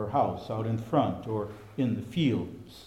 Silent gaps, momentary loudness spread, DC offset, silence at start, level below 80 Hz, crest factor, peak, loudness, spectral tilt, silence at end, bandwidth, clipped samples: none; 7 LU; under 0.1%; 0 s; -60 dBFS; 18 dB; -12 dBFS; -30 LUFS; -8 dB/octave; 0 s; 15 kHz; under 0.1%